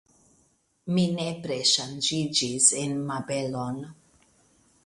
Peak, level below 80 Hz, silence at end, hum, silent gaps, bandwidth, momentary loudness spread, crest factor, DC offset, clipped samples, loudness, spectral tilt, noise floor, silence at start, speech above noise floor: -4 dBFS; -66 dBFS; 0.95 s; none; none; 11.5 kHz; 14 LU; 24 dB; under 0.1%; under 0.1%; -25 LUFS; -3 dB/octave; -67 dBFS; 0.85 s; 40 dB